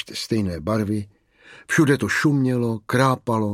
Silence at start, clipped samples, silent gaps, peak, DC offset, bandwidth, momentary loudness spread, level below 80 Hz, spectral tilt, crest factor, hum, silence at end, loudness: 0 s; under 0.1%; none; -2 dBFS; under 0.1%; 16 kHz; 7 LU; -52 dBFS; -6 dB/octave; 18 dB; none; 0 s; -21 LUFS